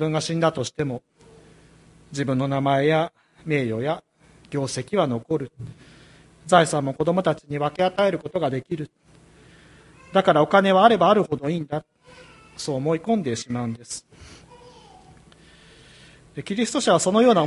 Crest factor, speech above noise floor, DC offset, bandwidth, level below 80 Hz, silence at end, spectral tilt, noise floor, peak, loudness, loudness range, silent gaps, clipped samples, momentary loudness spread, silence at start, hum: 24 dB; 30 dB; under 0.1%; 11.5 kHz; -58 dBFS; 0 s; -5.5 dB/octave; -52 dBFS; 0 dBFS; -22 LUFS; 8 LU; none; under 0.1%; 18 LU; 0 s; none